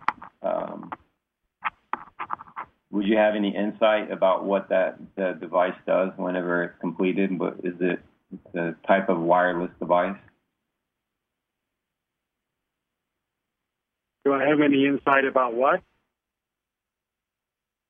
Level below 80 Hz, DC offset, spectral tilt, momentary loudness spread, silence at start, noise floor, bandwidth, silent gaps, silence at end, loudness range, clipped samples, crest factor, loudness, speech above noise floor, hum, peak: -68 dBFS; under 0.1%; -9 dB/octave; 15 LU; 0.1 s; -87 dBFS; 5.2 kHz; none; 2.1 s; 5 LU; under 0.1%; 20 dB; -24 LUFS; 64 dB; none; -6 dBFS